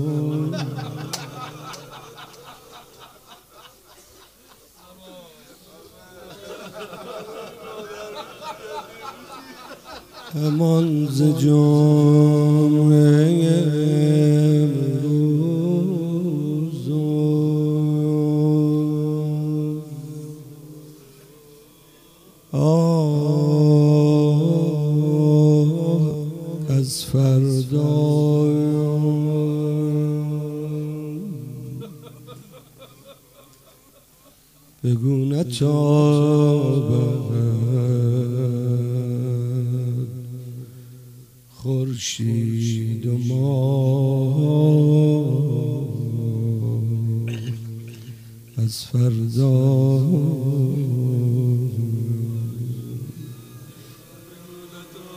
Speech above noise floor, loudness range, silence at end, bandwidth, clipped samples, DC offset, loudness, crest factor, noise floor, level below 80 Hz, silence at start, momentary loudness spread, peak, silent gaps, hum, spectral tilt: 37 dB; 18 LU; 0 s; 15.5 kHz; under 0.1%; under 0.1%; -20 LUFS; 14 dB; -53 dBFS; -60 dBFS; 0 s; 20 LU; -6 dBFS; none; none; -8 dB/octave